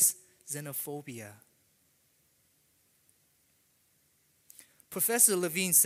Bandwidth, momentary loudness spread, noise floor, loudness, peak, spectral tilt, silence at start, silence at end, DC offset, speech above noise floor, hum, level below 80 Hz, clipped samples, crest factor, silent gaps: 16 kHz; 22 LU; -70 dBFS; -28 LUFS; -8 dBFS; -2 dB/octave; 0 s; 0 s; under 0.1%; 41 dB; none; -82 dBFS; under 0.1%; 24 dB; none